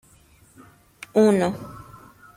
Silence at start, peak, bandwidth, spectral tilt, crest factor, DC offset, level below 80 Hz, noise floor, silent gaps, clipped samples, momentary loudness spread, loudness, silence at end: 1.15 s; -6 dBFS; 15.5 kHz; -6.5 dB/octave; 18 dB; under 0.1%; -58 dBFS; -55 dBFS; none; under 0.1%; 25 LU; -20 LUFS; 0.6 s